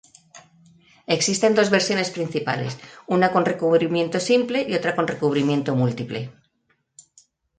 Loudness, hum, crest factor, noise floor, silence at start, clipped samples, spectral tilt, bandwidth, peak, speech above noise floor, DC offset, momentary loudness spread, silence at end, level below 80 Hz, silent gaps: -21 LUFS; none; 18 dB; -69 dBFS; 0.35 s; under 0.1%; -4.5 dB/octave; 9.4 kHz; -6 dBFS; 48 dB; under 0.1%; 12 LU; 1.25 s; -64 dBFS; none